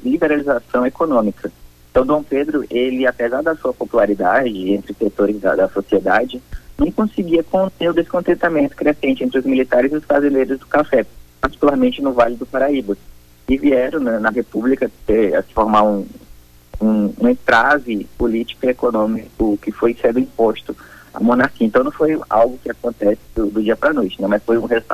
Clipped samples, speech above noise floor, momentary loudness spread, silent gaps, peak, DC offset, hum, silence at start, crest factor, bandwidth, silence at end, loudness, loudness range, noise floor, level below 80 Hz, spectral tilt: under 0.1%; 27 dB; 6 LU; none; -2 dBFS; under 0.1%; none; 0 s; 14 dB; 15 kHz; 0 s; -17 LUFS; 2 LU; -43 dBFS; -40 dBFS; -7 dB/octave